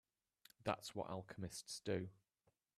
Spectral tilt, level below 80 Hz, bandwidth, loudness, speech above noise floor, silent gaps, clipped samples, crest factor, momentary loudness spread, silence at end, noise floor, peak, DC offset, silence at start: -4.5 dB/octave; -76 dBFS; 15 kHz; -47 LUFS; 38 dB; none; under 0.1%; 24 dB; 6 LU; 0.65 s; -84 dBFS; -24 dBFS; under 0.1%; 0.6 s